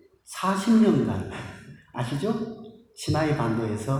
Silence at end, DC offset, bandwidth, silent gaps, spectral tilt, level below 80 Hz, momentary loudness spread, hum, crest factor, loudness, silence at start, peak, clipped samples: 0 s; under 0.1%; 13 kHz; none; -6.5 dB/octave; -56 dBFS; 21 LU; none; 16 dB; -25 LUFS; 0.3 s; -10 dBFS; under 0.1%